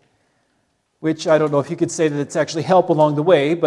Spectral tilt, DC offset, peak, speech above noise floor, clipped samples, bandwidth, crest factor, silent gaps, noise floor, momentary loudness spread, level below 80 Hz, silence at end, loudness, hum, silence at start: -6 dB/octave; under 0.1%; -2 dBFS; 50 dB; under 0.1%; 11.5 kHz; 18 dB; none; -66 dBFS; 8 LU; -66 dBFS; 0 s; -18 LUFS; none; 1 s